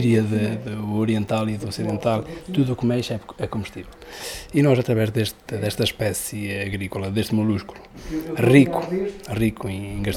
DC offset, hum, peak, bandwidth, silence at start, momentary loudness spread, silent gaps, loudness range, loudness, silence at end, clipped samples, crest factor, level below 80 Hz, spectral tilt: under 0.1%; none; 0 dBFS; 16.5 kHz; 0 s; 12 LU; none; 3 LU; -23 LUFS; 0 s; under 0.1%; 22 dB; -46 dBFS; -6 dB/octave